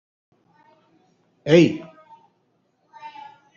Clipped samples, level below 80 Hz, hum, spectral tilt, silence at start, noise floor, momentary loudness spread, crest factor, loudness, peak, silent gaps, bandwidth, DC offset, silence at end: under 0.1%; -64 dBFS; none; -6 dB/octave; 1.45 s; -67 dBFS; 27 LU; 22 dB; -19 LUFS; -2 dBFS; none; 7.4 kHz; under 0.1%; 0.45 s